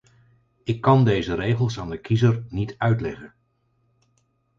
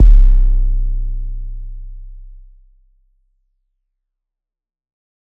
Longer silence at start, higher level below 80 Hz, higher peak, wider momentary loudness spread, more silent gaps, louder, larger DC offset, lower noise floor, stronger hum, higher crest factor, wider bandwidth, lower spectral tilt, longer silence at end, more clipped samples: first, 0.65 s vs 0 s; second, -48 dBFS vs -16 dBFS; second, -4 dBFS vs 0 dBFS; second, 14 LU vs 24 LU; neither; second, -22 LUFS vs -19 LUFS; neither; second, -68 dBFS vs -82 dBFS; neither; first, 20 dB vs 14 dB; first, 7.4 kHz vs 0.7 kHz; about the same, -8 dB/octave vs -9 dB/octave; second, 1.3 s vs 3 s; neither